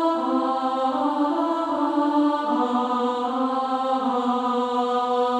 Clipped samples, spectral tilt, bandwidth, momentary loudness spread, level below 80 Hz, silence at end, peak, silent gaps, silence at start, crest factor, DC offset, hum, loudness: under 0.1%; -5 dB/octave; 10 kHz; 2 LU; -70 dBFS; 0 s; -10 dBFS; none; 0 s; 12 dB; under 0.1%; none; -23 LUFS